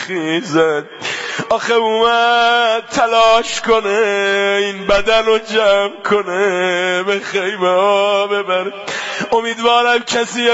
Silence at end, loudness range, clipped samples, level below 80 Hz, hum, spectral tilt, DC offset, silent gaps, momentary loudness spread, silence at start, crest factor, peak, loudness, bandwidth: 0 s; 2 LU; under 0.1%; -46 dBFS; none; -3 dB/octave; under 0.1%; none; 7 LU; 0 s; 14 dB; -2 dBFS; -14 LUFS; 8 kHz